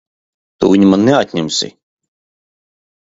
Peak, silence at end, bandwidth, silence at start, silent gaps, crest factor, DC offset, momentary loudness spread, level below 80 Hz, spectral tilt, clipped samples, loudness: 0 dBFS; 1.35 s; 8 kHz; 0.6 s; none; 16 dB; under 0.1%; 9 LU; -50 dBFS; -5.5 dB/octave; under 0.1%; -12 LUFS